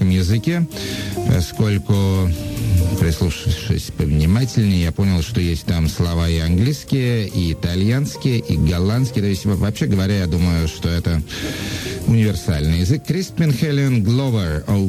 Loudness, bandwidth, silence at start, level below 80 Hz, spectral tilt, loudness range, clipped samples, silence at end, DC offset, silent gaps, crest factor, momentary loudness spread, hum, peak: -19 LUFS; 15.5 kHz; 0 s; -30 dBFS; -6.5 dB/octave; 1 LU; under 0.1%; 0 s; under 0.1%; none; 14 dB; 5 LU; none; -4 dBFS